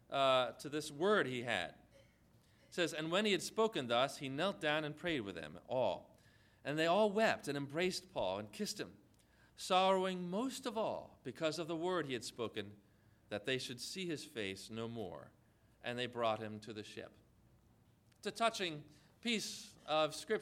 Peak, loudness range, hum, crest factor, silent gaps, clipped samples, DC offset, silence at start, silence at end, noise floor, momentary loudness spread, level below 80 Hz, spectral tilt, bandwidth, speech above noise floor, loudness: -18 dBFS; 7 LU; none; 20 dB; none; under 0.1%; under 0.1%; 0.1 s; 0 s; -69 dBFS; 15 LU; -74 dBFS; -4 dB/octave; 16 kHz; 31 dB; -38 LUFS